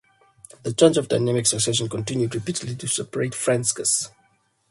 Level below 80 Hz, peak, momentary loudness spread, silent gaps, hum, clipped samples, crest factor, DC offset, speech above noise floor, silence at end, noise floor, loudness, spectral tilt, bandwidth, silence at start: -60 dBFS; -2 dBFS; 10 LU; none; none; under 0.1%; 22 dB; under 0.1%; 42 dB; 0.6 s; -64 dBFS; -22 LUFS; -4 dB/octave; 12 kHz; 0.65 s